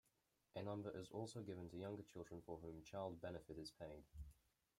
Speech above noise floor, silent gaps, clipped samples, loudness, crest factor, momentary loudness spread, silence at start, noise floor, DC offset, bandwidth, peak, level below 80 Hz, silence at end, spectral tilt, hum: 33 dB; none; under 0.1%; -54 LUFS; 20 dB; 8 LU; 0.55 s; -86 dBFS; under 0.1%; 16 kHz; -34 dBFS; -70 dBFS; 0.45 s; -6.5 dB/octave; none